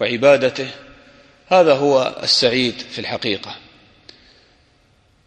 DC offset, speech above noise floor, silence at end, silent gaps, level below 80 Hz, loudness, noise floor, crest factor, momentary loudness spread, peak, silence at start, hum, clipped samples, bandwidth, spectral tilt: under 0.1%; 40 dB; 1.7 s; none; -58 dBFS; -17 LUFS; -57 dBFS; 18 dB; 16 LU; -2 dBFS; 0 s; none; under 0.1%; 9.8 kHz; -4 dB/octave